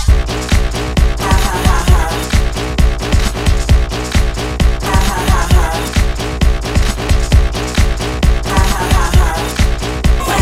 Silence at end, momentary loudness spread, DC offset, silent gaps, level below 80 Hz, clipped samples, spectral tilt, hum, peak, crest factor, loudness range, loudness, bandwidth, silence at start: 0 s; 4 LU; 0.5%; none; -14 dBFS; under 0.1%; -5 dB/octave; none; 0 dBFS; 12 dB; 1 LU; -15 LUFS; 16 kHz; 0 s